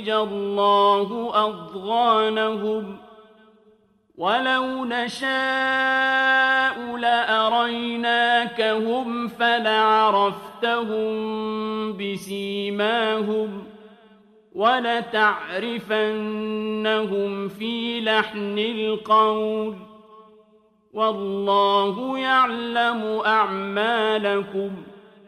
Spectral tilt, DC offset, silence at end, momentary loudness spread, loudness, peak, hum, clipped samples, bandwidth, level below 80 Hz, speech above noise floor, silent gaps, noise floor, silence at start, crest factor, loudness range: -4.5 dB/octave; under 0.1%; 0.3 s; 10 LU; -22 LUFS; -6 dBFS; none; under 0.1%; 13.5 kHz; -68 dBFS; 37 dB; none; -59 dBFS; 0 s; 16 dB; 5 LU